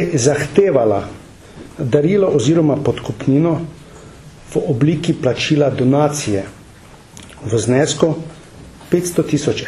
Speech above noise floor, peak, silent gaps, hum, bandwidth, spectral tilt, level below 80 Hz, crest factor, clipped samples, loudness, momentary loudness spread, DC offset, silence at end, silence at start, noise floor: 26 dB; 0 dBFS; none; none; 13.5 kHz; -6 dB/octave; -46 dBFS; 16 dB; under 0.1%; -16 LUFS; 11 LU; under 0.1%; 0 s; 0 s; -41 dBFS